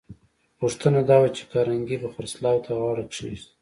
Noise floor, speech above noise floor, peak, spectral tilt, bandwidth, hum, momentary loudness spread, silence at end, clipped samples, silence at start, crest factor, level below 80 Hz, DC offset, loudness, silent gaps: -49 dBFS; 26 dB; -6 dBFS; -6.5 dB/octave; 11.5 kHz; none; 15 LU; 0.2 s; under 0.1%; 0.1 s; 18 dB; -56 dBFS; under 0.1%; -24 LUFS; none